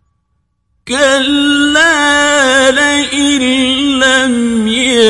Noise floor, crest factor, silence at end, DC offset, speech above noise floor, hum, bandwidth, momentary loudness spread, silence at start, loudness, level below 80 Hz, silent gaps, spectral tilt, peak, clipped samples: -63 dBFS; 10 dB; 0 s; under 0.1%; 53 dB; none; 11.5 kHz; 4 LU; 0.85 s; -9 LUFS; -42 dBFS; none; -2 dB/octave; 0 dBFS; 0.2%